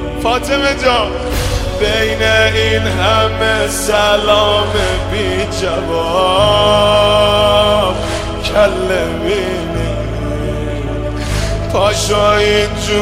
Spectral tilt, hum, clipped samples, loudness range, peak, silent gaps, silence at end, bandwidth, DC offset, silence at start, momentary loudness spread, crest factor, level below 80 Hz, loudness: -4 dB/octave; none; under 0.1%; 5 LU; -2 dBFS; none; 0 s; 16.5 kHz; under 0.1%; 0 s; 9 LU; 12 dB; -24 dBFS; -13 LUFS